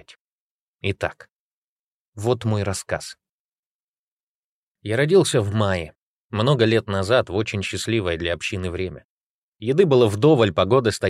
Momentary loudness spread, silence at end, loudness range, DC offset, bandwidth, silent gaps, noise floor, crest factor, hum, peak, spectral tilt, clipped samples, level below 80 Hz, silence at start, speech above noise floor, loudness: 13 LU; 0 s; 8 LU; under 0.1%; 14.5 kHz; 1.32-2.13 s, 3.29-4.75 s, 5.97-6.30 s, 9.05-9.53 s; under -90 dBFS; 18 dB; none; -4 dBFS; -5.5 dB/octave; under 0.1%; -50 dBFS; 0.85 s; over 70 dB; -21 LUFS